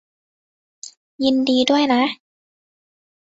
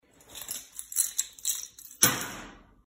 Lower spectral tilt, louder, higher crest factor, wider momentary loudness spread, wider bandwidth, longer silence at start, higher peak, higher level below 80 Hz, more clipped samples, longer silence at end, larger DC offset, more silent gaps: first, -3 dB/octave vs -0.5 dB/octave; first, -18 LUFS vs -28 LUFS; second, 18 dB vs 28 dB; about the same, 22 LU vs 20 LU; second, 8 kHz vs 16.5 kHz; first, 0.85 s vs 0.3 s; about the same, -4 dBFS vs -4 dBFS; about the same, -62 dBFS vs -62 dBFS; neither; first, 1.1 s vs 0.25 s; neither; first, 0.97-1.19 s vs none